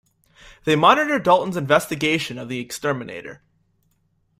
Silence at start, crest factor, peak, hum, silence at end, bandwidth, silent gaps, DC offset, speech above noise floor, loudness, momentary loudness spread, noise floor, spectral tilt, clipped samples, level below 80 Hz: 0.45 s; 20 dB; -2 dBFS; none; 1.05 s; 16 kHz; none; under 0.1%; 46 dB; -20 LUFS; 15 LU; -66 dBFS; -4.5 dB/octave; under 0.1%; -58 dBFS